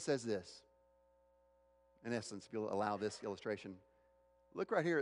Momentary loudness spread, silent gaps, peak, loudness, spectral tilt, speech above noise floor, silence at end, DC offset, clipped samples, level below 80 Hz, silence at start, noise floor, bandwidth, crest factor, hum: 16 LU; none; -22 dBFS; -42 LUFS; -5 dB/octave; 32 dB; 0 s; under 0.1%; under 0.1%; -80 dBFS; 0 s; -73 dBFS; 11 kHz; 20 dB; 60 Hz at -70 dBFS